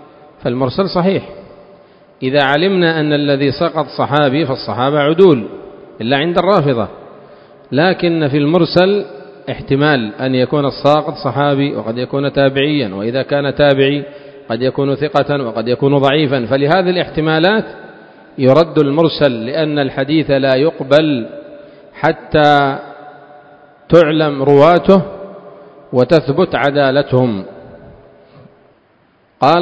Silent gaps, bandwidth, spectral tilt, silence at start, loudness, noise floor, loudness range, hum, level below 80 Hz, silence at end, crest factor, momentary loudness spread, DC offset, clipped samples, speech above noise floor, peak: none; 8 kHz; -8 dB/octave; 0.4 s; -13 LUFS; -53 dBFS; 3 LU; none; -46 dBFS; 0 s; 14 dB; 11 LU; under 0.1%; 0.2%; 40 dB; 0 dBFS